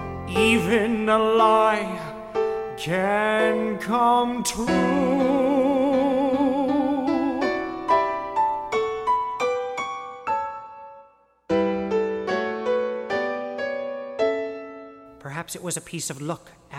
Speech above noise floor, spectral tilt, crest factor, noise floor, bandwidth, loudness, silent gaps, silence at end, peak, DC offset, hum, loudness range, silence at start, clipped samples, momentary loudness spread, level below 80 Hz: 32 dB; -4.5 dB/octave; 18 dB; -54 dBFS; 16 kHz; -23 LUFS; none; 0 s; -6 dBFS; under 0.1%; none; 6 LU; 0 s; under 0.1%; 13 LU; -52 dBFS